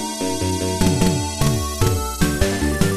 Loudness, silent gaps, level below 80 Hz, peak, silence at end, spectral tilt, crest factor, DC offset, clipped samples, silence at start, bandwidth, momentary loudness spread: -20 LUFS; none; -28 dBFS; -2 dBFS; 0 s; -5 dB/octave; 18 dB; under 0.1%; under 0.1%; 0 s; 14 kHz; 4 LU